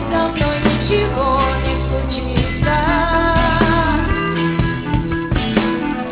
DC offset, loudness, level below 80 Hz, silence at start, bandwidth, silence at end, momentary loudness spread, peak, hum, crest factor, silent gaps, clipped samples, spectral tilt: under 0.1%; -17 LUFS; -24 dBFS; 0 s; 4 kHz; 0 s; 5 LU; 0 dBFS; none; 16 dB; none; under 0.1%; -10.5 dB/octave